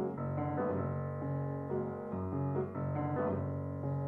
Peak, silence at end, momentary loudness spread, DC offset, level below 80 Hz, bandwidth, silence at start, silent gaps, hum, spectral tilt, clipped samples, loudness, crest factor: -24 dBFS; 0 s; 4 LU; under 0.1%; -68 dBFS; 3 kHz; 0 s; none; none; -12 dB/octave; under 0.1%; -37 LUFS; 12 dB